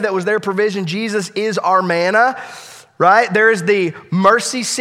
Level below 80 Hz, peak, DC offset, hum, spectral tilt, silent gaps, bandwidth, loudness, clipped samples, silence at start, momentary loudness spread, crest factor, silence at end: -66 dBFS; 0 dBFS; under 0.1%; none; -4 dB/octave; none; 15 kHz; -15 LUFS; under 0.1%; 0 s; 8 LU; 16 dB; 0 s